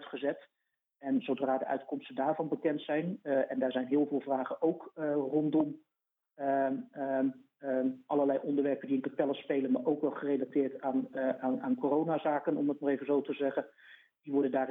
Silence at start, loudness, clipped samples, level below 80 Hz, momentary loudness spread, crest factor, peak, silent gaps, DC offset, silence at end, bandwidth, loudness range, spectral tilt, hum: 0 s; -33 LUFS; under 0.1%; -86 dBFS; 6 LU; 16 dB; -16 dBFS; none; under 0.1%; 0 s; 3.9 kHz; 1 LU; -9.5 dB/octave; none